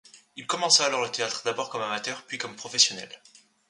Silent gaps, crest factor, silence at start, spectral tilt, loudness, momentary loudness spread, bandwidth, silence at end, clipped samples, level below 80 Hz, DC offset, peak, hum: none; 24 dB; 0.15 s; 0 dB/octave; -25 LUFS; 19 LU; 11.5 kHz; 0.55 s; under 0.1%; -78 dBFS; under 0.1%; -6 dBFS; none